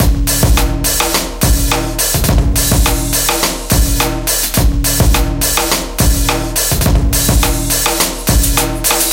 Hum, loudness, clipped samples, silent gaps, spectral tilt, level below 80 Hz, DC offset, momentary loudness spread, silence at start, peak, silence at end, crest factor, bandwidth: none; -12 LUFS; under 0.1%; none; -3.5 dB/octave; -16 dBFS; under 0.1%; 2 LU; 0 s; 0 dBFS; 0 s; 12 dB; 17.5 kHz